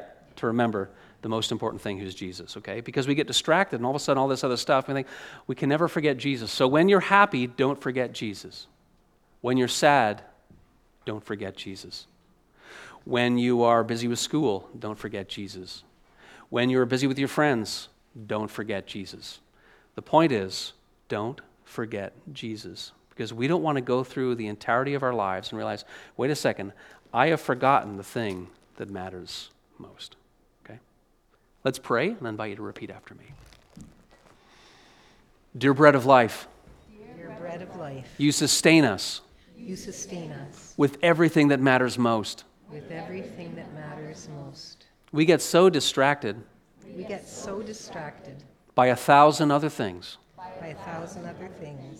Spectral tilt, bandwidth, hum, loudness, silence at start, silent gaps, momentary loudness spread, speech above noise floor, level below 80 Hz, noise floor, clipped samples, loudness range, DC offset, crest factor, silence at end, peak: -4.5 dB/octave; 16.5 kHz; none; -24 LUFS; 0 s; none; 21 LU; 39 dB; -64 dBFS; -65 dBFS; under 0.1%; 9 LU; under 0.1%; 26 dB; 0 s; 0 dBFS